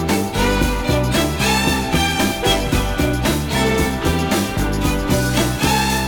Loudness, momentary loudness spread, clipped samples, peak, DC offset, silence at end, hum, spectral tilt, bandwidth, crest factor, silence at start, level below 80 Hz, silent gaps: -18 LUFS; 3 LU; under 0.1%; -2 dBFS; under 0.1%; 0 s; none; -4.5 dB/octave; over 20 kHz; 14 dB; 0 s; -26 dBFS; none